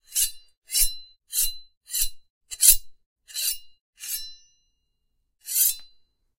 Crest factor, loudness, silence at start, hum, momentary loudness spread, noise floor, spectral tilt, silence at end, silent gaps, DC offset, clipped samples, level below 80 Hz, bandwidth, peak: 28 dB; -22 LUFS; 0.1 s; none; 23 LU; -73 dBFS; 4 dB/octave; 0.5 s; 0.57-0.62 s, 1.77-1.81 s, 2.30-2.41 s, 3.06-3.16 s, 3.81-3.93 s; under 0.1%; under 0.1%; -40 dBFS; 16 kHz; 0 dBFS